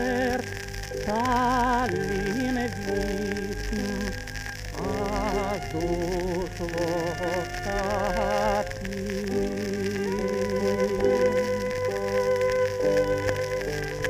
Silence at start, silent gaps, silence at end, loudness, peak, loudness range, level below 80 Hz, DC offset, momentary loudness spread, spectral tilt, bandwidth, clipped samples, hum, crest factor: 0 s; none; 0 s; -27 LUFS; -10 dBFS; 4 LU; -40 dBFS; under 0.1%; 7 LU; -5.5 dB/octave; 15.5 kHz; under 0.1%; 50 Hz at -40 dBFS; 16 dB